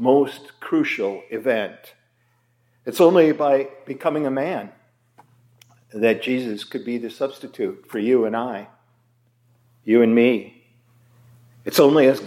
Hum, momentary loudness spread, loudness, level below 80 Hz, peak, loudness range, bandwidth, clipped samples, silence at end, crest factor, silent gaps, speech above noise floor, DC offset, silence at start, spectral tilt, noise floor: none; 16 LU; -20 LUFS; -76 dBFS; -2 dBFS; 5 LU; 16.5 kHz; under 0.1%; 0 s; 18 dB; none; 45 dB; under 0.1%; 0 s; -5.5 dB/octave; -64 dBFS